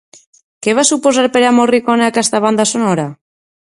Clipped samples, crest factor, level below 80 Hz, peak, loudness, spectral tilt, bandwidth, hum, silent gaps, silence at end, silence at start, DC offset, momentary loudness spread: under 0.1%; 14 dB; -60 dBFS; 0 dBFS; -12 LUFS; -3.5 dB/octave; 11.5 kHz; none; none; 0.65 s; 0.6 s; under 0.1%; 6 LU